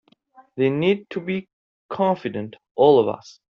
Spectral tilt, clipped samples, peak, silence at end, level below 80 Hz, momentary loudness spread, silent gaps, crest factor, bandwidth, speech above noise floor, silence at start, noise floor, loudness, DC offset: -5.5 dB/octave; under 0.1%; -4 dBFS; 0.2 s; -66 dBFS; 17 LU; 1.53-1.89 s, 2.71-2.75 s; 18 dB; 7 kHz; 34 dB; 0.55 s; -54 dBFS; -21 LUFS; under 0.1%